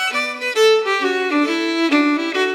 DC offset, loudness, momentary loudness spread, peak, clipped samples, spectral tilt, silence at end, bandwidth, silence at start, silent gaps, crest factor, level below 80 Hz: under 0.1%; -17 LUFS; 5 LU; -4 dBFS; under 0.1%; -1 dB/octave; 0 s; 17 kHz; 0 s; none; 14 dB; under -90 dBFS